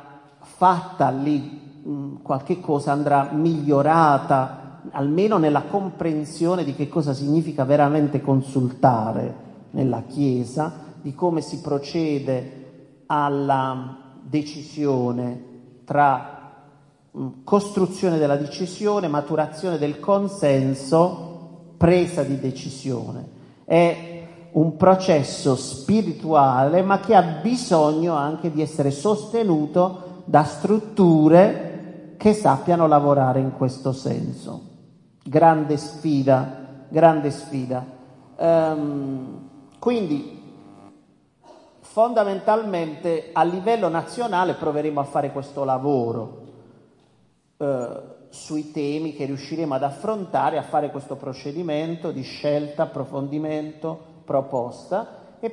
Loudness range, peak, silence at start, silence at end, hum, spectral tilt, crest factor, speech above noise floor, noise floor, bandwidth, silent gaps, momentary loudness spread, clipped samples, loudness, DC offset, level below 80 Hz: 8 LU; -2 dBFS; 0.05 s; 0 s; none; -7 dB/octave; 20 dB; 40 dB; -61 dBFS; 11.5 kHz; none; 15 LU; under 0.1%; -21 LUFS; under 0.1%; -62 dBFS